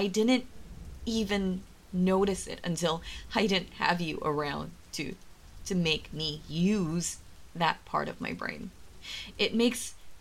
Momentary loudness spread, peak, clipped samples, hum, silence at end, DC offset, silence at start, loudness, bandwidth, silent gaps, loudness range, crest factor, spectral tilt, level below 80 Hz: 15 LU; -10 dBFS; under 0.1%; none; 0 s; under 0.1%; 0 s; -31 LUFS; 16 kHz; none; 2 LU; 20 dB; -4.5 dB/octave; -50 dBFS